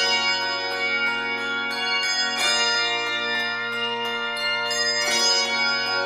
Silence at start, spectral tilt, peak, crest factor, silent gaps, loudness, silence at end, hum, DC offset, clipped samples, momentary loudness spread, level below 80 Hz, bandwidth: 0 s; 0 dB/octave; -10 dBFS; 14 dB; none; -21 LUFS; 0 s; none; under 0.1%; under 0.1%; 6 LU; -66 dBFS; 15.5 kHz